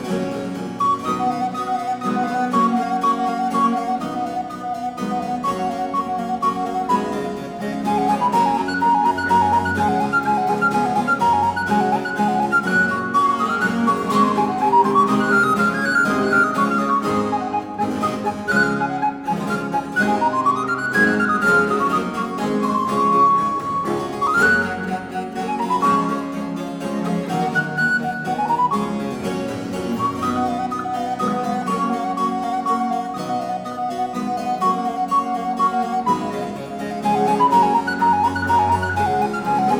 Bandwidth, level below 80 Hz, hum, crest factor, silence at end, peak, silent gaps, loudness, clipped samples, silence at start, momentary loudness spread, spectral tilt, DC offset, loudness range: 17.5 kHz; -54 dBFS; none; 16 dB; 0 s; -4 dBFS; none; -20 LUFS; under 0.1%; 0 s; 9 LU; -5.5 dB/octave; under 0.1%; 5 LU